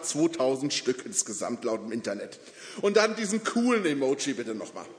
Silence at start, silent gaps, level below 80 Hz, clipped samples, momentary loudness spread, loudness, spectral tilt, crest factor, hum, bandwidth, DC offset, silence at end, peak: 0 s; none; -78 dBFS; under 0.1%; 12 LU; -28 LUFS; -3 dB/octave; 20 dB; none; 11 kHz; under 0.1%; 0 s; -8 dBFS